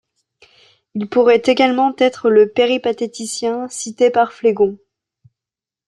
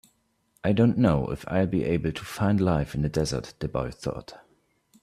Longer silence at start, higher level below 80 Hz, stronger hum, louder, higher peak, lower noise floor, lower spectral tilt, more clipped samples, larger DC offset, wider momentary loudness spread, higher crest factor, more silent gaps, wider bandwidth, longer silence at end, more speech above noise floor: first, 0.95 s vs 0.65 s; second, -64 dBFS vs -46 dBFS; neither; first, -16 LUFS vs -26 LUFS; first, -2 dBFS vs -8 dBFS; first, -88 dBFS vs -68 dBFS; second, -4 dB/octave vs -7 dB/octave; neither; neither; about the same, 11 LU vs 10 LU; about the same, 14 dB vs 18 dB; neither; second, 12 kHz vs 14.5 kHz; first, 1.15 s vs 0.65 s; first, 73 dB vs 43 dB